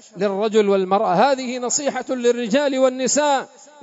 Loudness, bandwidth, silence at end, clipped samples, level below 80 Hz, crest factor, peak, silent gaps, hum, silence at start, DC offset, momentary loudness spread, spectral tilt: -19 LUFS; 8 kHz; 0.35 s; under 0.1%; -74 dBFS; 16 dB; -4 dBFS; none; none; 0.15 s; under 0.1%; 6 LU; -3.5 dB/octave